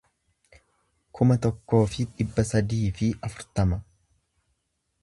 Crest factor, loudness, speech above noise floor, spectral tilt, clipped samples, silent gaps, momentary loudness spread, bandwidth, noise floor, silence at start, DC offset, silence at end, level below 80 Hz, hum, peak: 20 dB; -26 LUFS; 52 dB; -7 dB/octave; under 0.1%; none; 7 LU; 11.5 kHz; -76 dBFS; 1.15 s; under 0.1%; 1.2 s; -42 dBFS; none; -6 dBFS